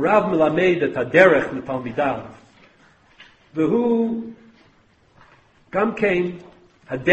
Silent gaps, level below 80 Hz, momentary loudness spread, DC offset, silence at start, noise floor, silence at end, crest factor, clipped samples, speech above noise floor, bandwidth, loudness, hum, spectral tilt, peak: none; -56 dBFS; 17 LU; under 0.1%; 0 s; -57 dBFS; 0 s; 20 dB; under 0.1%; 38 dB; 8.4 kHz; -20 LUFS; none; -7 dB/octave; 0 dBFS